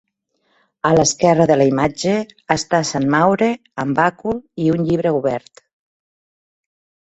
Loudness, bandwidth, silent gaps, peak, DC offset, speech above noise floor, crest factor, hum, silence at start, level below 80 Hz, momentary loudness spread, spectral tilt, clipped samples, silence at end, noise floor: -17 LUFS; 8.2 kHz; none; 0 dBFS; under 0.1%; 50 dB; 18 dB; none; 0.85 s; -50 dBFS; 9 LU; -5 dB/octave; under 0.1%; 1.65 s; -66 dBFS